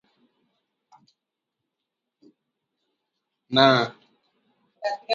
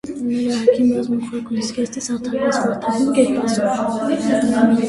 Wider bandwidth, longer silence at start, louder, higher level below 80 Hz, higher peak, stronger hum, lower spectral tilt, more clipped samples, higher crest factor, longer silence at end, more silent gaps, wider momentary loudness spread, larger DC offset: second, 7.4 kHz vs 11.5 kHz; first, 3.5 s vs 0.05 s; about the same, -21 LUFS vs -19 LUFS; second, -74 dBFS vs -54 dBFS; about the same, -2 dBFS vs -2 dBFS; neither; about the same, -5.5 dB/octave vs -5 dB/octave; neither; first, 26 dB vs 16 dB; about the same, 0 s vs 0 s; neither; first, 14 LU vs 8 LU; neither